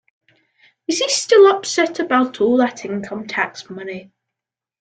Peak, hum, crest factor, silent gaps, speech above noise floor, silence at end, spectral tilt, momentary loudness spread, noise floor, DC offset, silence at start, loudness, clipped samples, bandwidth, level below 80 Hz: -2 dBFS; none; 16 dB; none; 69 dB; 0.8 s; -3 dB/octave; 19 LU; -86 dBFS; under 0.1%; 0.9 s; -17 LUFS; under 0.1%; 9.4 kHz; -66 dBFS